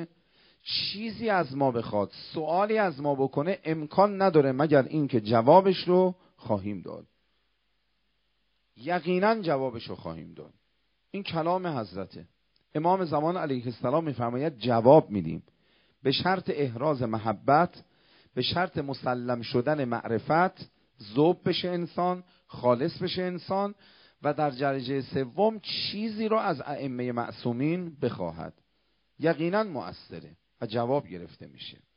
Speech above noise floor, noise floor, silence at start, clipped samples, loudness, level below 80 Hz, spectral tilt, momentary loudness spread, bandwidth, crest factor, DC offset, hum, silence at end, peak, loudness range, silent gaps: 48 dB; -76 dBFS; 0 s; under 0.1%; -27 LUFS; -66 dBFS; -5 dB/octave; 16 LU; 5.4 kHz; 24 dB; under 0.1%; none; 0.25 s; -4 dBFS; 8 LU; none